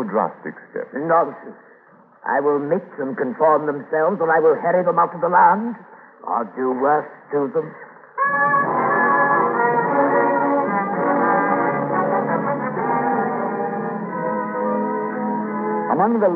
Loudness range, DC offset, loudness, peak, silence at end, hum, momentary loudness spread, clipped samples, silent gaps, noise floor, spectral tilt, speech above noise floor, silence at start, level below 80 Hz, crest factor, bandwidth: 5 LU; under 0.1%; -19 LUFS; -4 dBFS; 0 s; none; 10 LU; under 0.1%; none; -50 dBFS; -11 dB/octave; 31 dB; 0 s; -74 dBFS; 16 dB; 3.9 kHz